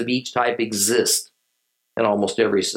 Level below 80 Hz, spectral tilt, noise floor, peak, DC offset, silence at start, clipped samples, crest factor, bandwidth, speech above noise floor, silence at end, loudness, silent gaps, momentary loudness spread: -70 dBFS; -2.5 dB/octave; -73 dBFS; -4 dBFS; under 0.1%; 0 s; under 0.1%; 18 dB; 17 kHz; 53 dB; 0 s; -20 LUFS; none; 5 LU